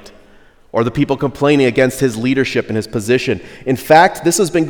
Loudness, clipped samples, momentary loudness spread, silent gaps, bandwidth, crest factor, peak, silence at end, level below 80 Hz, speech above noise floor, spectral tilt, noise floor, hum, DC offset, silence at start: -15 LUFS; 0.2%; 11 LU; none; over 20 kHz; 14 dB; 0 dBFS; 0 s; -46 dBFS; 31 dB; -5 dB/octave; -45 dBFS; none; under 0.1%; 0.05 s